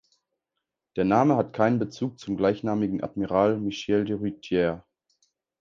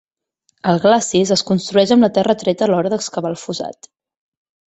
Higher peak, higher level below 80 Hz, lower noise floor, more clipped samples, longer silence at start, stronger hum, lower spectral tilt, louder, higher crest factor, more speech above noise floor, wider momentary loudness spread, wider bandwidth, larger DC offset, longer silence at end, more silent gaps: second, -6 dBFS vs -2 dBFS; about the same, -58 dBFS vs -58 dBFS; first, -84 dBFS vs -66 dBFS; neither; first, 0.95 s vs 0.65 s; neither; first, -7.5 dB/octave vs -5 dB/octave; second, -25 LUFS vs -16 LUFS; about the same, 20 dB vs 16 dB; first, 59 dB vs 50 dB; about the same, 9 LU vs 11 LU; second, 7.4 kHz vs 8.2 kHz; neither; second, 0.8 s vs 0.95 s; neither